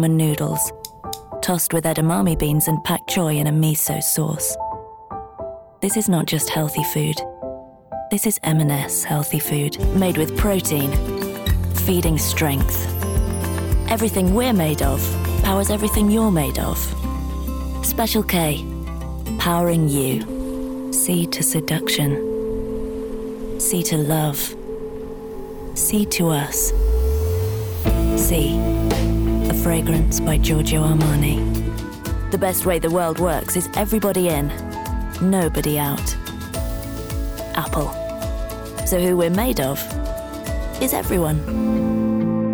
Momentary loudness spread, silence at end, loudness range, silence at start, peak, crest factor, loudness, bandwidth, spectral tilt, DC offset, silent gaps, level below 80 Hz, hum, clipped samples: 10 LU; 0 s; 4 LU; 0 s; -10 dBFS; 10 dB; -20 LUFS; over 20 kHz; -5 dB/octave; under 0.1%; none; -28 dBFS; none; under 0.1%